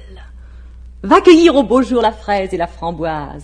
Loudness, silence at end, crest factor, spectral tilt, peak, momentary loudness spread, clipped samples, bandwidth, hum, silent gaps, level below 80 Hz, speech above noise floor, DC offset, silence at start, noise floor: -13 LUFS; 0 s; 14 dB; -5.5 dB/octave; 0 dBFS; 14 LU; 0.2%; 10 kHz; none; none; -34 dBFS; 22 dB; under 0.1%; 0.05 s; -35 dBFS